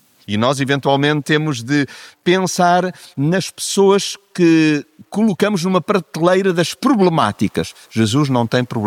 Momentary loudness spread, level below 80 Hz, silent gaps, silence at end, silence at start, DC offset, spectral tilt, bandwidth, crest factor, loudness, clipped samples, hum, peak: 8 LU; -58 dBFS; none; 0 s; 0.3 s; under 0.1%; -5.5 dB/octave; 16 kHz; 16 dB; -16 LUFS; under 0.1%; none; 0 dBFS